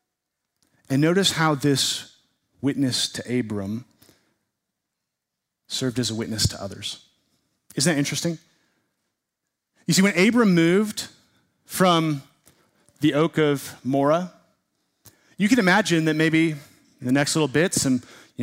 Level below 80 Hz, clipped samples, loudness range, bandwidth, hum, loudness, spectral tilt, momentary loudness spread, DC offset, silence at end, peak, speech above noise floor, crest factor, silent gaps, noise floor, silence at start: -56 dBFS; under 0.1%; 8 LU; 16 kHz; none; -22 LUFS; -4.5 dB/octave; 15 LU; under 0.1%; 0 s; -6 dBFS; 62 dB; 18 dB; none; -83 dBFS; 0.9 s